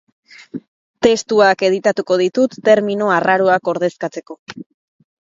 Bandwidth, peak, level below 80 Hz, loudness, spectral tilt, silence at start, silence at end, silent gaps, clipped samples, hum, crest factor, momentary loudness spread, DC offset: 7.8 kHz; 0 dBFS; -60 dBFS; -15 LUFS; -4.5 dB/octave; 0.55 s; 0.6 s; 0.68-0.94 s, 4.39-4.46 s; under 0.1%; none; 16 dB; 20 LU; under 0.1%